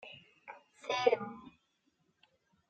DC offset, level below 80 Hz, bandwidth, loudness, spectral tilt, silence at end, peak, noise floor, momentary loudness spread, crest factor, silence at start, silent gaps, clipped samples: under 0.1%; -84 dBFS; 8.6 kHz; -34 LUFS; -3.5 dB/octave; 1.2 s; -14 dBFS; -77 dBFS; 22 LU; 26 dB; 0.05 s; none; under 0.1%